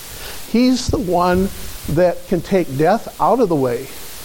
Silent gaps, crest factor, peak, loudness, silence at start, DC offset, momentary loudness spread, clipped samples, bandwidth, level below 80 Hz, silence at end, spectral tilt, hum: none; 14 dB; -2 dBFS; -17 LUFS; 0 s; under 0.1%; 11 LU; under 0.1%; 17 kHz; -36 dBFS; 0 s; -6 dB/octave; none